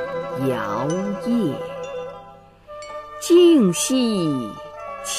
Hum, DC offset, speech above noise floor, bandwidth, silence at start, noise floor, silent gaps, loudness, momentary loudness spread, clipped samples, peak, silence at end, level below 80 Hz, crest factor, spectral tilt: 50 Hz at -50 dBFS; under 0.1%; 26 dB; 15.5 kHz; 0 s; -45 dBFS; none; -20 LUFS; 20 LU; under 0.1%; -6 dBFS; 0 s; -56 dBFS; 16 dB; -5 dB/octave